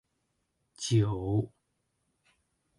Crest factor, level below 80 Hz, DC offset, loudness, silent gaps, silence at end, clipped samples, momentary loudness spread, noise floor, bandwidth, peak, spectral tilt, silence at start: 18 dB; -56 dBFS; under 0.1%; -30 LUFS; none; 1.3 s; under 0.1%; 11 LU; -79 dBFS; 11.5 kHz; -16 dBFS; -6 dB/octave; 0.8 s